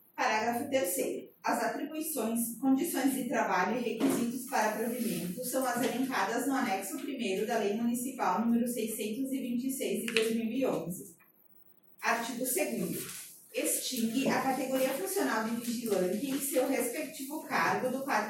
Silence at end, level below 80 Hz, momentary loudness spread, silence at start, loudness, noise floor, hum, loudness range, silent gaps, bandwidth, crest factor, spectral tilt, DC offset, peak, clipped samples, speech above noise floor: 0 s; -78 dBFS; 6 LU; 0.15 s; -32 LUFS; -61 dBFS; none; 3 LU; none; 17 kHz; 24 dB; -3.5 dB/octave; under 0.1%; -10 dBFS; under 0.1%; 29 dB